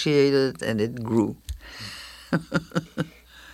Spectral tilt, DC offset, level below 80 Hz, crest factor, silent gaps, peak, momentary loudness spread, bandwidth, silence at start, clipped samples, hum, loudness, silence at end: -6 dB/octave; under 0.1%; -48 dBFS; 18 dB; none; -8 dBFS; 16 LU; 14.5 kHz; 0 s; under 0.1%; none; -25 LUFS; 0 s